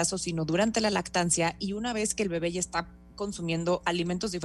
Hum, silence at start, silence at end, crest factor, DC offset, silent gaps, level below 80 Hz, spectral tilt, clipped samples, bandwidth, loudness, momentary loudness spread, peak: none; 0 s; 0 s; 18 dB; under 0.1%; none; -52 dBFS; -4 dB/octave; under 0.1%; 12.5 kHz; -29 LUFS; 8 LU; -12 dBFS